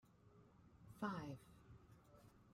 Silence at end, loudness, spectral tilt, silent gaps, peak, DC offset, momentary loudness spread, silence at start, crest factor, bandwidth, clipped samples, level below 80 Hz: 0 s; -50 LUFS; -7 dB/octave; none; -30 dBFS; under 0.1%; 21 LU; 0.05 s; 24 dB; 16 kHz; under 0.1%; -76 dBFS